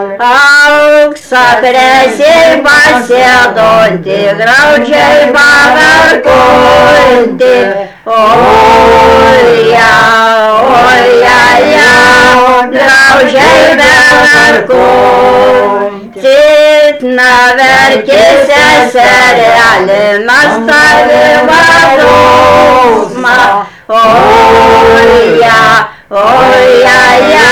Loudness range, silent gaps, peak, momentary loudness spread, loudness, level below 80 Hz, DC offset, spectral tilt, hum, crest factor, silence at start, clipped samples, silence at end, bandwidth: 2 LU; none; 0 dBFS; 5 LU; -3 LUFS; -32 dBFS; 0.5%; -3.5 dB/octave; none; 4 dB; 0 s; 3%; 0 s; over 20 kHz